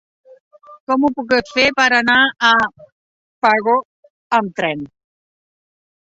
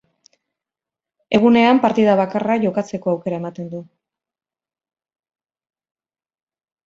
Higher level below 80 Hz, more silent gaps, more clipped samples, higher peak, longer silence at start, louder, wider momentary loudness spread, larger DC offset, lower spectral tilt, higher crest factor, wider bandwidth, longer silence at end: first, -56 dBFS vs -62 dBFS; first, 0.80-0.87 s, 2.92-3.42 s, 3.85-4.03 s, 4.10-4.30 s vs none; neither; about the same, 0 dBFS vs -2 dBFS; second, 0.7 s vs 1.3 s; about the same, -15 LUFS vs -17 LUFS; second, 10 LU vs 17 LU; neither; second, -3.5 dB/octave vs -7 dB/octave; about the same, 18 dB vs 20 dB; about the same, 8 kHz vs 7.6 kHz; second, 1.25 s vs 3 s